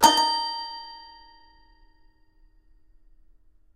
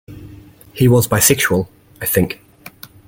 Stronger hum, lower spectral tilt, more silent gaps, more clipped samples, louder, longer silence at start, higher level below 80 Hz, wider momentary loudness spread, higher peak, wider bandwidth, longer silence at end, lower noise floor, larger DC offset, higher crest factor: neither; second, -0.5 dB/octave vs -4.5 dB/octave; neither; neither; second, -24 LUFS vs -15 LUFS; about the same, 0 s vs 0.1 s; second, -58 dBFS vs -44 dBFS; about the same, 25 LU vs 23 LU; about the same, -2 dBFS vs 0 dBFS; about the same, 16 kHz vs 17 kHz; first, 2.7 s vs 0.4 s; first, -58 dBFS vs -40 dBFS; neither; first, 26 dB vs 18 dB